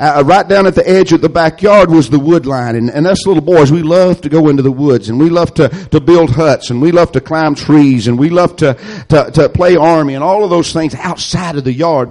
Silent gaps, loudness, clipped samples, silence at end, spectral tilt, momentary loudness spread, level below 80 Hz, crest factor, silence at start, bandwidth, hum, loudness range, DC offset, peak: none; -9 LUFS; under 0.1%; 0 s; -6.5 dB/octave; 7 LU; -36 dBFS; 8 dB; 0 s; 11.5 kHz; none; 2 LU; under 0.1%; 0 dBFS